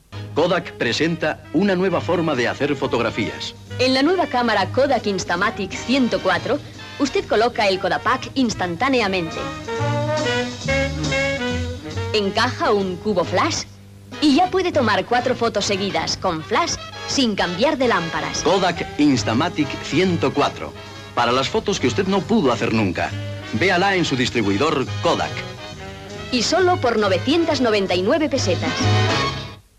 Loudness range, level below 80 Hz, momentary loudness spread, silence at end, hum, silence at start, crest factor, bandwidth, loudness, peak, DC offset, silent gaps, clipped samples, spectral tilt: 2 LU; -44 dBFS; 9 LU; 0.2 s; none; 0.1 s; 14 dB; 14 kHz; -20 LUFS; -6 dBFS; under 0.1%; none; under 0.1%; -4.5 dB/octave